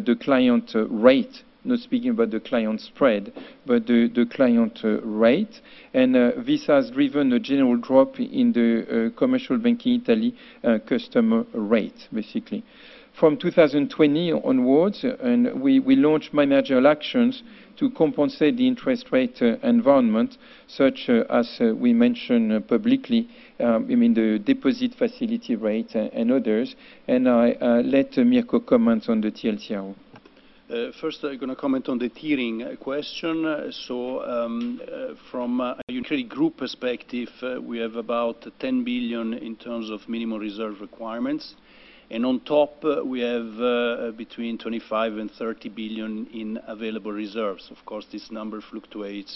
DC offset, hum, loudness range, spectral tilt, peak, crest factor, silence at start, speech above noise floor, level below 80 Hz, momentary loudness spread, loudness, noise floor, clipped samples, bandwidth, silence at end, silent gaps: under 0.1%; none; 8 LU; -7.5 dB/octave; -2 dBFS; 20 dB; 0 s; 30 dB; -60 dBFS; 13 LU; -23 LUFS; -52 dBFS; under 0.1%; 6 kHz; 0 s; 35.83-35.87 s